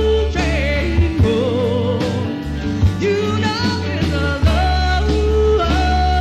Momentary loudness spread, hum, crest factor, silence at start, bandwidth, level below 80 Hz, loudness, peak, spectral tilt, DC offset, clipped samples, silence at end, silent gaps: 4 LU; none; 12 dB; 0 s; 9.4 kHz; -22 dBFS; -17 LUFS; -4 dBFS; -6.5 dB/octave; under 0.1%; under 0.1%; 0 s; none